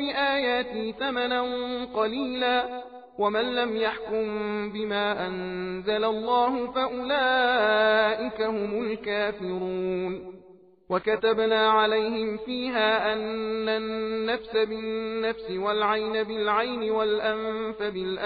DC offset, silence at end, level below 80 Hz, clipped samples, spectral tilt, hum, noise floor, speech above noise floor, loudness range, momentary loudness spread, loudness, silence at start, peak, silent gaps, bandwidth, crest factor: under 0.1%; 0 s; -60 dBFS; under 0.1%; -1.5 dB/octave; none; -53 dBFS; 27 dB; 3 LU; 9 LU; -26 LUFS; 0 s; -10 dBFS; none; 5 kHz; 16 dB